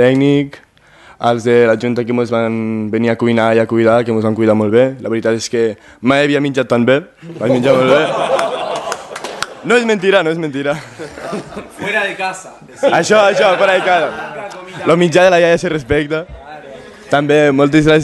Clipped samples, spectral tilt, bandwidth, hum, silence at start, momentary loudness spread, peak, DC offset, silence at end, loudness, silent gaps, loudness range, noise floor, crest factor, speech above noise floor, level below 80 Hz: under 0.1%; -5.5 dB/octave; 12.5 kHz; none; 0 s; 15 LU; 0 dBFS; under 0.1%; 0 s; -13 LUFS; none; 4 LU; -43 dBFS; 14 dB; 31 dB; -46 dBFS